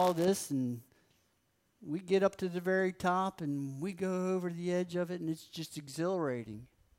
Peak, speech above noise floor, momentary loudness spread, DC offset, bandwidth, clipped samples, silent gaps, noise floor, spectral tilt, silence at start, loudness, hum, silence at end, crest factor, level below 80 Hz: -18 dBFS; 42 dB; 12 LU; under 0.1%; 16 kHz; under 0.1%; none; -76 dBFS; -6 dB/octave; 0 s; -35 LUFS; none; 0.35 s; 18 dB; -72 dBFS